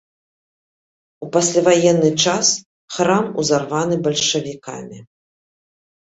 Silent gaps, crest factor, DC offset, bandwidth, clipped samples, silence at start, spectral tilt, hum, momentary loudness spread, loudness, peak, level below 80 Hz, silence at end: 2.66-2.88 s; 18 dB; under 0.1%; 8.2 kHz; under 0.1%; 1.2 s; -3.5 dB/octave; none; 18 LU; -17 LUFS; -2 dBFS; -60 dBFS; 1.1 s